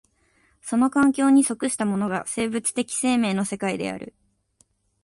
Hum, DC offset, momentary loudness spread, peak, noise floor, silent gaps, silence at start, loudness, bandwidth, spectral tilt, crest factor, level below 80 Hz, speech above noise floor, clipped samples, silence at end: none; under 0.1%; 12 LU; -8 dBFS; -64 dBFS; none; 0.65 s; -23 LUFS; 11.5 kHz; -4.5 dB/octave; 16 dB; -62 dBFS; 42 dB; under 0.1%; 0.95 s